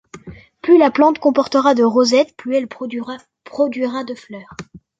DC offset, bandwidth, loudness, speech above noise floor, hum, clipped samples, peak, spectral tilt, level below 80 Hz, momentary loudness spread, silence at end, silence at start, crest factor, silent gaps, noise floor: under 0.1%; 9 kHz; -16 LUFS; 22 dB; none; under 0.1%; -2 dBFS; -4.5 dB/octave; -58 dBFS; 21 LU; 0.25 s; 0.15 s; 16 dB; none; -38 dBFS